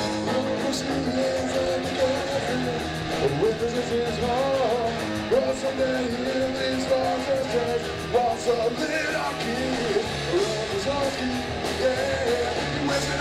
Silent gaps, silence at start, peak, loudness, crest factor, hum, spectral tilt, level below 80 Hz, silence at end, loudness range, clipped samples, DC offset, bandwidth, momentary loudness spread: none; 0 s; -10 dBFS; -25 LUFS; 14 dB; none; -4.5 dB/octave; -46 dBFS; 0 s; 1 LU; under 0.1%; under 0.1%; 15.5 kHz; 3 LU